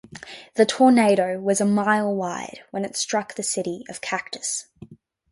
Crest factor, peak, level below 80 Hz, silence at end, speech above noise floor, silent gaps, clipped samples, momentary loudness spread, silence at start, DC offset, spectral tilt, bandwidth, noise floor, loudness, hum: 18 dB; -4 dBFS; -66 dBFS; 0.35 s; 20 dB; none; under 0.1%; 15 LU; 0.1 s; under 0.1%; -4 dB/octave; 11.5 kHz; -42 dBFS; -22 LUFS; none